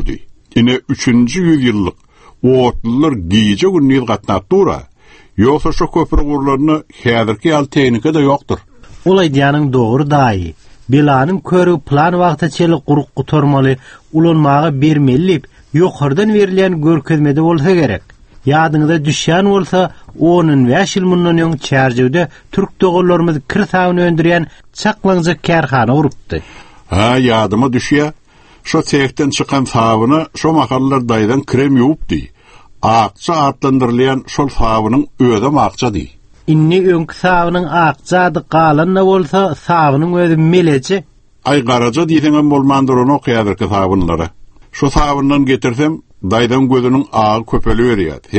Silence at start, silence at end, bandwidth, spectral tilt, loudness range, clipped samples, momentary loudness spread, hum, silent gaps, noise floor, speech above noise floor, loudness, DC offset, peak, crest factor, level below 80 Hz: 0 s; 0 s; 8.8 kHz; -6.5 dB/octave; 2 LU; under 0.1%; 7 LU; none; none; -40 dBFS; 29 dB; -12 LUFS; under 0.1%; 0 dBFS; 12 dB; -30 dBFS